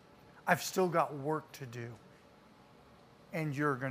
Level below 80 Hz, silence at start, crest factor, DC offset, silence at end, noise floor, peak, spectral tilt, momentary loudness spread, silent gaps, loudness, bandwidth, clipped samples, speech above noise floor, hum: -74 dBFS; 0.25 s; 24 dB; under 0.1%; 0 s; -60 dBFS; -12 dBFS; -5 dB/octave; 15 LU; none; -35 LUFS; 15.5 kHz; under 0.1%; 26 dB; none